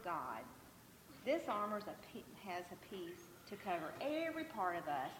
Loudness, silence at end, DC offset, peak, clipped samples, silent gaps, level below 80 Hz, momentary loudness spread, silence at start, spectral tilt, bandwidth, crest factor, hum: -44 LUFS; 0 s; under 0.1%; -26 dBFS; under 0.1%; none; -76 dBFS; 16 LU; 0 s; -4.5 dB/octave; 17.5 kHz; 18 dB; none